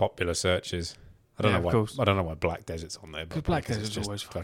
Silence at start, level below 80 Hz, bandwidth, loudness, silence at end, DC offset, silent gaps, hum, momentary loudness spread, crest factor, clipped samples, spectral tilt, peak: 0 s; -46 dBFS; 16.5 kHz; -29 LUFS; 0 s; under 0.1%; none; none; 12 LU; 20 dB; under 0.1%; -5 dB/octave; -8 dBFS